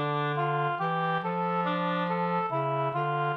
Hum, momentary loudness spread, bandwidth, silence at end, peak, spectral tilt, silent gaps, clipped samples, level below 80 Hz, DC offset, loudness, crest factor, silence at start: none; 1 LU; 5.6 kHz; 0 s; -16 dBFS; -8.5 dB/octave; none; under 0.1%; -76 dBFS; under 0.1%; -29 LUFS; 12 dB; 0 s